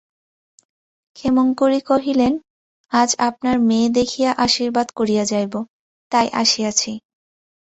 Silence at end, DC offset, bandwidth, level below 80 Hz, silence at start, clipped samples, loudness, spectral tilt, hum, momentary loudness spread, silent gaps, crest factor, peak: 0.75 s; under 0.1%; 8.2 kHz; -54 dBFS; 1.15 s; under 0.1%; -18 LUFS; -3 dB/octave; none; 10 LU; 2.50-2.84 s, 5.70-6.11 s; 18 dB; -2 dBFS